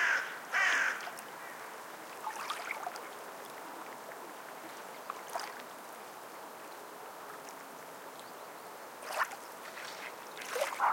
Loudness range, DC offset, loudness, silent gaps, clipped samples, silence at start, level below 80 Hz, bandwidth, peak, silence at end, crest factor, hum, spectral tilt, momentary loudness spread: 10 LU; under 0.1%; -39 LUFS; none; under 0.1%; 0 s; under -90 dBFS; 17 kHz; -18 dBFS; 0 s; 22 dB; none; -0.5 dB/octave; 16 LU